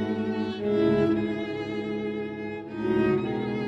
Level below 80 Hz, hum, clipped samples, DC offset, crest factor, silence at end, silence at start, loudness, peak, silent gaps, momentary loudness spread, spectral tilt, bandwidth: -54 dBFS; none; under 0.1%; under 0.1%; 16 dB; 0 s; 0 s; -27 LUFS; -12 dBFS; none; 9 LU; -8 dB/octave; 8 kHz